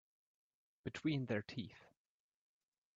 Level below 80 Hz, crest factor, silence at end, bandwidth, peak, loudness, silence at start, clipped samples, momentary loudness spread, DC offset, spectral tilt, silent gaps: -78 dBFS; 20 dB; 1.15 s; 7.8 kHz; -26 dBFS; -43 LUFS; 0.85 s; under 0.1%; 12 LU; under 0.1%; -5.5 dB/octave; none